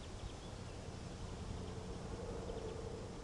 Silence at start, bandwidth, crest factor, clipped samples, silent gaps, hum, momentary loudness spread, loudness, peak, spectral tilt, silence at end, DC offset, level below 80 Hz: 0 s; 11.5 kHz; 14 dB; under 0.1%; none; none; 4 LU; -48 LUFS; -32 dBFS; -5.5 dB/octave; 0 s; under 0.1%; -54 dBFS